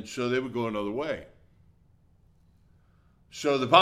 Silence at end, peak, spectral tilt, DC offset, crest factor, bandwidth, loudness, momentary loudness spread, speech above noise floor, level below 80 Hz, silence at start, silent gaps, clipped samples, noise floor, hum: 0 s; -2 dBFS; -4.5 dB/octave; under 0.1%; 26 dB; 14.5 kHz; -29 LUFS; 9 LU; 36 dB; -62 dBFS; 0 s; none; under 0.1%; -62 dBFS; none